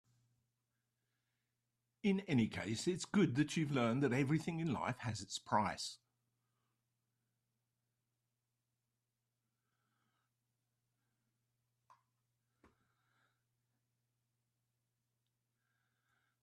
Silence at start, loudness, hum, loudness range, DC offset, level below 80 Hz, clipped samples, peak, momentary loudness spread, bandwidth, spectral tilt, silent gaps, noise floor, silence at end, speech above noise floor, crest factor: 2.05 s; -38 LUFS; none; 8 LU; under 0.1%; -76 dBFS; under 0.1%; -20 dBFS; 8 LU; 13 kHz; -5.5 dB/octave; none; -89 dBFS; 10.5 s; 52 dB; 22 dB